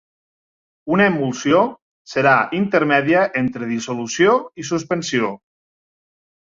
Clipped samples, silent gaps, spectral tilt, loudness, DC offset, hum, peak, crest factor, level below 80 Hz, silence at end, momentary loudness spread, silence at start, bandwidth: under 0.1%; 1.82-2.05 s; -5 dB/octave; -18 LUFS; under 0.1%; none; -2 dBFS; 18 dB; -60 dBFS; 1.1 s; 9 LU; 0.85 s; 7.6 kHz